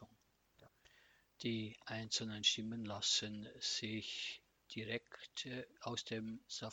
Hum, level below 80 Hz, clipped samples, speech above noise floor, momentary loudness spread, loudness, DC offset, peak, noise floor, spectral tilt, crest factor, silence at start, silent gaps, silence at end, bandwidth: none; -78 dBFS; under 0.1%; 32 dB; 12 LU; -42 LUFS; under 0.1%; -20 dBFS; -75 dBFS; -2.5 dB/octave; 24 dB; 0 s; none; 0 s; 18.5 kHz